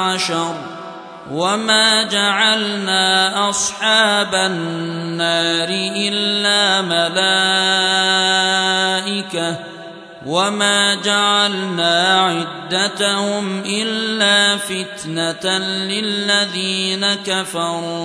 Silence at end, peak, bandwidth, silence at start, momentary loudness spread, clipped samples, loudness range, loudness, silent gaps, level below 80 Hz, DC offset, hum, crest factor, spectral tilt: 0 s; 0 dBFS; 11 kHz; 0 s; 10 LU; under 0.1%; 3 LU; -15 LUFS; none; -66 dBFS; under 0.1%; none; 16 dB; -2 dB/octave